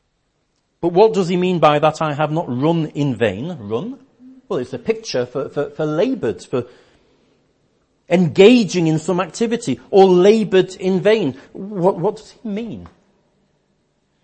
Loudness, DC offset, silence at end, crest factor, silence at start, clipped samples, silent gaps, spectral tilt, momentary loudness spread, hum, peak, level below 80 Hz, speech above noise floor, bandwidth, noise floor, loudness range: -17 LUFS; under 0.1%; 1.35 s; 18 dB; 0.85 s; under 0.1%; none; -6.5 dB/octave; 15 LU; none; 0 dBFS; -58 dBFS; 50 dB; 8.8 kHz; -67 dBFS; 9 LU